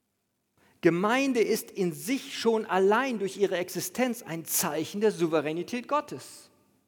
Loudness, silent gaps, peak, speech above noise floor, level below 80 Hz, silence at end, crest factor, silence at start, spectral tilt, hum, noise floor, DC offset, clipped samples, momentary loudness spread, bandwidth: -28 LUFS; none; -8 dBFS; 50 dB; -78 dBFS; 0.45 s; 20 dB; 0.85 s; -4 dB/octave; none; -78 dBFS; under 0.1%; under 0.1%; 8 LU; over 20 kHz